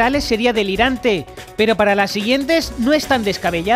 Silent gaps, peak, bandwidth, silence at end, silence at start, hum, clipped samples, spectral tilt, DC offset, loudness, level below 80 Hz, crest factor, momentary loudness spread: none; -2 dBFS; 15.5 kHz; 0 s; 0 s; none; under 0.1%; -4.5 dB/octave; under 0.1%; -17 LUFS; -38 dBFS; 14 dB; 4 LU